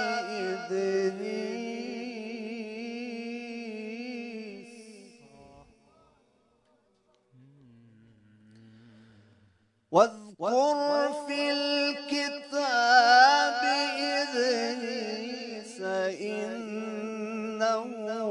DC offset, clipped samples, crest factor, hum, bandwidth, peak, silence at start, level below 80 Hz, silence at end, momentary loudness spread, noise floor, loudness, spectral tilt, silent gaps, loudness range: under 0.1%; under 0.1%; 22 dB; none; 11 kHz; -8 dBFS; 0 s; -78 dBFS; 0 s; 15 LU; -69 dBFS; -28 LUFS; -3 dB/octave; none; 17 LU